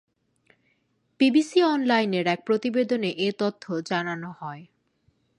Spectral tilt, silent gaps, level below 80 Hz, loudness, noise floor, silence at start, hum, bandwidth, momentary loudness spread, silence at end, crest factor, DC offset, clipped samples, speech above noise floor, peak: -5.5 dB/octave; none; -74 dBFS; -24 LUFS; -70 dBFS; 1.2 s; none; 11 kHz; 14 LU; 0.75 s; 18 dB; under 0.1%; under 0.1%; 46 dB; -8 dBFS